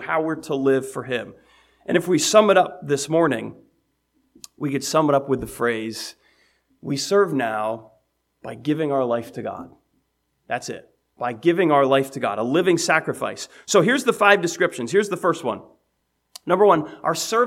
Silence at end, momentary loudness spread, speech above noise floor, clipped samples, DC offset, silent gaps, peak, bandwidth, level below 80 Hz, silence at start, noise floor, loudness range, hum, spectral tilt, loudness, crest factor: 0 s; 16 LU; 51 dB; under 0.1%; under 0.1%; none; 0 dBFS; 16 kHz; -62 dBFS; 0 s; -72 dBFS; 6 LU; none; -4.5 dB/octave; -21 LUFS; 22 dB